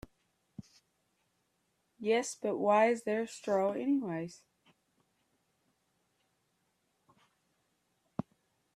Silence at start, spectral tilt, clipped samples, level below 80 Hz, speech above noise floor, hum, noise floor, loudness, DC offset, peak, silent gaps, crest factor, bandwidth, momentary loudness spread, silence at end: 0.6 s; -5 dB/octave; under 0.1%; -74 dBFS; 47 dB; none; -79 dBFS; -32 LUFS; under 0.1%; -16 dBFS; none; 22 dB; 13.5 kHz; 24 LU; 0.55 s